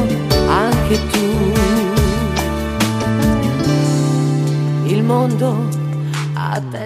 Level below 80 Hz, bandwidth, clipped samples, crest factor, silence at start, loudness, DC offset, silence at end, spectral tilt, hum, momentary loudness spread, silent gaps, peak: -28 dBFS; 15.5 kHz; under 0.1%; 14 dB; 0 s; -16 LUFS; under 0.1%; 0 s; -6 dB/octave; none; 6 LU; none; 0 dBFS